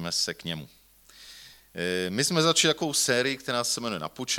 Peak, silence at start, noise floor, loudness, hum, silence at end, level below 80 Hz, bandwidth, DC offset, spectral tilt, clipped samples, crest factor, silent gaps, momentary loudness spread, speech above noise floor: -8 dBFS; 0 s; -53 dBFS; -26 LUFS; none; 0 s; -64 dBFS; 19 kHz; under 0.1%; -2.5 dB/octave; under 0.1%; 20 dB; none; 19 LU; 26 dB